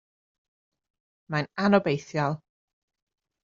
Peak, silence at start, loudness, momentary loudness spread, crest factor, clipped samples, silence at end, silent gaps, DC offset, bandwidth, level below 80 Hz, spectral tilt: -6 dBFS; 1.3 s; -26 LUFS; 9 LU; 24 dB; under 0.1%; 1.05 s; none; under 0.1%; 7.4 kHz; -66 dBFS; -5.5 dB/octave